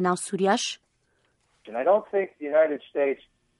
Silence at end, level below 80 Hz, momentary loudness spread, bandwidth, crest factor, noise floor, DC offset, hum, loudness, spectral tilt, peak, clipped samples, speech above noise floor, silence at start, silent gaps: 0.45 s; -74 dBFS; 11 LU; 11.5 kHz; 18 dB; -70 dBFS; under 0.1%; none; -25 LUFS; -4 dB/octave; -8 dBFS; under 0.1%; 45 dB; 0 s; none